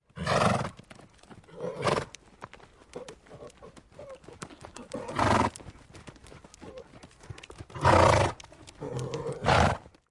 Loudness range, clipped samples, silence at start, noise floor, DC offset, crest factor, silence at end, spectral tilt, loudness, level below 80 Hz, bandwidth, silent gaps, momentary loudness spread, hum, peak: 10 LU; under 0.1%; 0.15 s; -53 dBFS; under 0.1%; 22 dB; 0.3 s; -5 dB/octave; -27 LUFS; -48 dBFS; 11.5 kHz; none; 25 LU; none; -8 dBFS